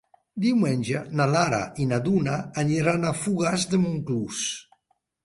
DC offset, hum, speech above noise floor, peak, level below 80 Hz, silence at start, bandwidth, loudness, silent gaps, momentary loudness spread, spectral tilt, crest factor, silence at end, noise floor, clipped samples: under 0.1%; none; 47 dB; -6 dBFS; -58 dBFS; 0.35 s; 11.5 kHz; -25 LUFS; none; 6 LU; -5.5 dB/octave; 18 dB; 0.6 s; -71 dBFS; under 0.1%